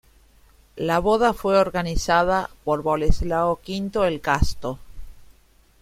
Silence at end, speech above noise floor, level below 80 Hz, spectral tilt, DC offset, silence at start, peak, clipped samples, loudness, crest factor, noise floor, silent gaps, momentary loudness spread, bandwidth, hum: 0.6 s; 35 dB; -32 dBFS; -5.5 dB/octave; under 0.1%; 0.75 s; -4 dBFS; under 0.1%; -22 LUFS; 20 dB; -56 dBFS; none; 8 LU; 15.5 kHz; none